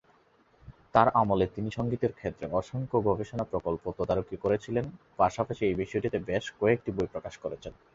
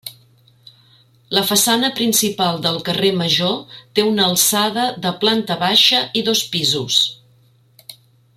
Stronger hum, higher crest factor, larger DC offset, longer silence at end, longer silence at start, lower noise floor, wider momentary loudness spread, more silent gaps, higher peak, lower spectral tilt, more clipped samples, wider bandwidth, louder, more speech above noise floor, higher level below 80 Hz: neither; first, 24 dB vs 18 dB; neither; second, 0.25 s vs 0.45 s; first, 0.65 s vs 0.05 s; first, -64 dBFS vs -54 dBFS; first, 10 LU vs 7 LU; neither; second, -6 dBFS vs 0 dBFS; first, -7.5 dB/octave vs -2.5 dB/octave; neither; second, 7.8 kHz vs 16.5 kHz; second, -30 LUFS vs -16 LUFS; about the same, 35 dB vs 36 dB; first, -52 dBFS vs -60 dBFS